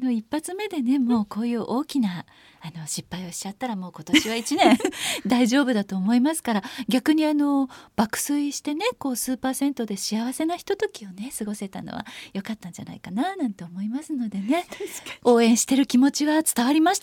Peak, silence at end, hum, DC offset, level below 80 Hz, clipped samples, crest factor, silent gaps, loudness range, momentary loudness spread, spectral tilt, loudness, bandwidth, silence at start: -4 dBFS; 0.05 s; none; under 0.1%; -62 dBFS; under 0.1%; 20 dB; none; 9 LU; 14 LU; -4 dB/octave; -24 LUFS; 17.5 kHz; 0 s